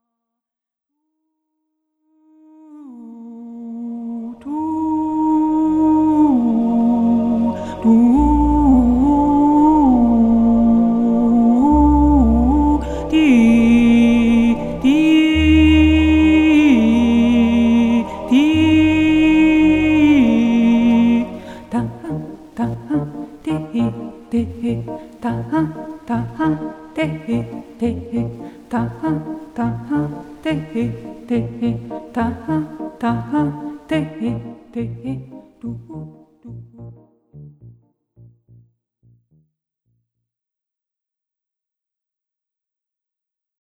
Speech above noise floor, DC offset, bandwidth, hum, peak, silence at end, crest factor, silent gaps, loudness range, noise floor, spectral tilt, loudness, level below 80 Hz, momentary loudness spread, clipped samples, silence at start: 64 dB; under 0.1%; 8.6 kHz; none; -2 dBFS; 5.9 s; 14 dB; none; 12 LU; -87 dBFS; -7.5 dB/octave; -15 LUFS; -30 dBFS; 16 LU; under 0.1%; 2.7 s